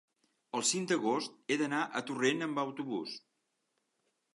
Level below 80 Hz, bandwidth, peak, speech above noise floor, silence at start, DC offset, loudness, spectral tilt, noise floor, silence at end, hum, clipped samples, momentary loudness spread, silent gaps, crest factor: -86 dBFS; 11.5 kHz; -16 dBFS; 47 dB; 0.55 s; under 0.1%; -34 LUFS; -3 dB/octave; -81 dBFS; 1.15 s; none; under 0.1%; 8 LU; none; 20 dB